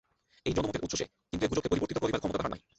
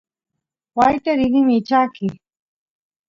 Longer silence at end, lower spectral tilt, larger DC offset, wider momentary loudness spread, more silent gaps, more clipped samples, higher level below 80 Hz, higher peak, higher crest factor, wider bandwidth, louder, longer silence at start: second, 0.2 s vs 0.95 s; second, -5 dB/octave vs -7 dB/octave; neither; second, 5 LU vs 12 LU; neither; neither; about the same, -50 dBFS vs -52 dBFS; second, -14 dBFS vs -2 dBFS; about the same, 18 dB vs 18 dB; first, 8.4 kHz vs 7.4 kHz; second, -33 LUFS vs -18 LUFS; second, 0.45 s vs 0.75 s